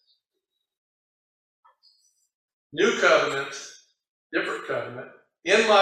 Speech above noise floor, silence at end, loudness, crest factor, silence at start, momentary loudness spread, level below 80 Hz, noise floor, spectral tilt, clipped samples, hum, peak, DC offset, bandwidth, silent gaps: 59 dB; 0 s; -24 LUFS; 22 dB; 2.75 s; 20 LU; -74 dBFS; -82 dBFS; -2.5 dB/octave; under 0.1%; none; -6 dBFS; under 0.1%; 12 kHz; 4.09-4.30 s